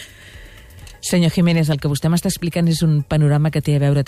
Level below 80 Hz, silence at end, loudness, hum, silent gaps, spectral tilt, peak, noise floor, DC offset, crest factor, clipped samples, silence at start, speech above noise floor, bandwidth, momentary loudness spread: -42 dBFS; 0 s; -17 LUFS; none; none; -6 dB/octave; -8 dBFS; -40 dBFS; under 0.1%; 10 dB; under 0.1%; 0 s; 24 dB; 15 kHz; 5 LU